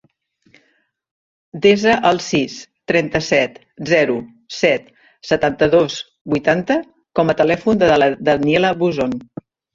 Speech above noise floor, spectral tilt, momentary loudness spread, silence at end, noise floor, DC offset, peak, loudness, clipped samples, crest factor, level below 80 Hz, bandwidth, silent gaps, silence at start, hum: 47 dB; -5 dB/octave; 15 LU; 0.5 s; -63 dBFS; under 0.1%; -2 dBFS; -17 LUFS; under 0.1%; 16 dB; -50 dBFS; 7.8 kHz; 6.21-6.25 s; 1.55 s; none